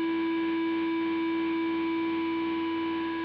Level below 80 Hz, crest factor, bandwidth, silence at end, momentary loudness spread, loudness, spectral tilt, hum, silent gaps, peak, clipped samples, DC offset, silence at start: -72 dBFS; 6 dB; 5.2 kHz; 0 s; 2 LU; -29 LUFS; -7.5 dB/octave; none; none; -22 dBFS; under 0.1%; under 0.1%; 0 s